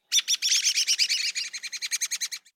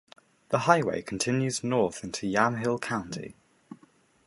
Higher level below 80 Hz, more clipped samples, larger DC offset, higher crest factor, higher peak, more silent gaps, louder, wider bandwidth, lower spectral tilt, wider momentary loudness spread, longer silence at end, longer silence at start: second, under -90 dBFS vs -62 dBFS; neither; neither; second, 18 dB vs 24 dB; second, -10 dBFS vs -6 dBFS; neither; first, -24 LUFS vs -27 LUFS; first, 17 kHz vs 11.5 kHz; second, 7 dB/octave vs -5 dB/octave; about the same, 10 LU vs 10 LU; second, 0.15 s vs 0.5 s; second, 0.1 s vs 0.5 s